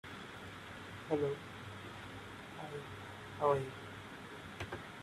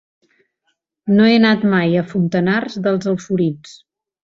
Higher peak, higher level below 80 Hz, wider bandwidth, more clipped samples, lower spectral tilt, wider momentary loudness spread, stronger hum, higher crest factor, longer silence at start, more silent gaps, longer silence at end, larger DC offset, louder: second, -18 dBFS vs -2 dBFS; second, -68 dBFS vs -58 dBFS; first, 14 kHz vs 7.6 kHz; neither; second, -5.5 dB/octave vs -7 dB/octave; first, 14 LU vs 8 LU; neither; first, 24 dB vs 16 dB; second, 0.05 s vs 1.05 s; neither; second, 0 s vs 0.5 s; neither; second, -42 LUFS vs -16 LUFS